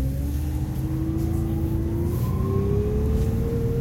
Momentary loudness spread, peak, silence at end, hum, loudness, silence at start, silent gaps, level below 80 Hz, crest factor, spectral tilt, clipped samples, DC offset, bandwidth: 4 LU; -10 dBFS; 0 s; none; -25 LUFS; 0 s; none; -30 dBFS; 12 dB; -9 dB/octave; under 0.1%; under 0.1%; 16.5 kHz